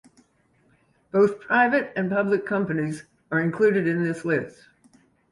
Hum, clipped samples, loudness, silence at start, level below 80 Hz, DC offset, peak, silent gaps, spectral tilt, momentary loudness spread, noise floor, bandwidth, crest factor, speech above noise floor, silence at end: none; under 0.1%; -23 LUFS; 1.15 s; -66 dBFS; under 0.1%; -8 dBFS; none; -7.5 dB/octave; 8 LU; -64 dBFS; 11.5 kHz; 18 dB; 41 dB; 0.8 s